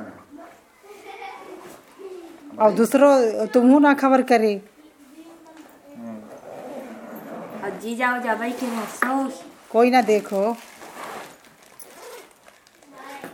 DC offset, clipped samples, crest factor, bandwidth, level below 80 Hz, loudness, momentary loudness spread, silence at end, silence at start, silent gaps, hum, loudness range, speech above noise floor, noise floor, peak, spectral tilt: under 0.1%; under 0.1%; 20 dB; 17.5 kHz; -72 dBFS; -19 LUFS; 25 LU; 0.05 s; 0 s; none; none; 12 LU; 34 dB; -52 dBFS; -4 dBFS; -5 dB/octave